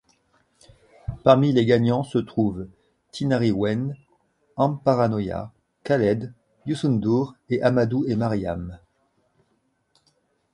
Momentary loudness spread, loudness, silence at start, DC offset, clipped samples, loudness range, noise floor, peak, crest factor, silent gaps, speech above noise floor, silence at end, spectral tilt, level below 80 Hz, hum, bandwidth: 20 LU; -23 LUFS; 1.1 s; under 0.1%; under 0.1%; 3 LU; -69 dBFS; 0 dBFS; 22 dB; none; 48 dB; 1.75 s; -8 dB/octave; -50 dBFS; none; 11 kHz